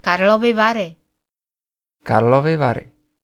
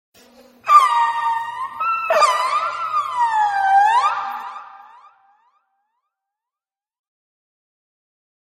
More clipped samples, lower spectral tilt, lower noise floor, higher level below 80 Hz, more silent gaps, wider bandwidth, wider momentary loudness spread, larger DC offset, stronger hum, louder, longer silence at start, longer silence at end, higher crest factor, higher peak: neither; first, -7 dB/octave vs 0 dB/octave; about the same, under -90 dBFS vs under -90 dBFS; first, -54 dBFS vs -74 dBFS; neither; second, 14 kHz vs 15.5 kHz; about the same, 14 LU vs 15 LU; neither; neither; about the same, -16 LUFS vs -17 LUFS; second, 0.05 s vs 0.65 s; second, 0.4 s vs 3.7 s; about the same, 18 dB vs 20 dB; about the same, 0 dBFS vs 0 dBFS